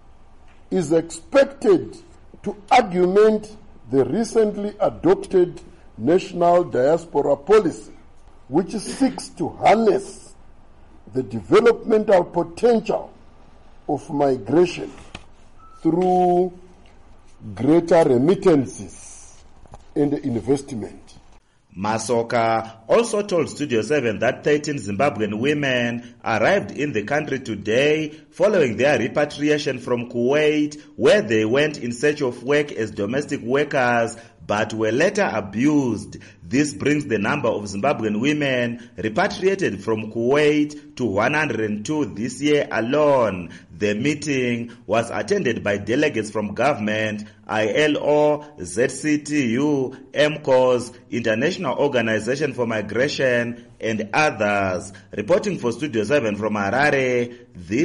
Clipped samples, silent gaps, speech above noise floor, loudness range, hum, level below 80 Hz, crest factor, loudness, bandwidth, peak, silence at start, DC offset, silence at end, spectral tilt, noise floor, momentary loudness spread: under 0.1%; none; 30 dB; 3 LU; none; -50 dBFS; 14 dB; -20 LUFS; 11.5 kHz; -8 dBFS; 0.7 s; under 0.1%; 0 s; -5.5 dB/octave; -51 dBFS; 10 LU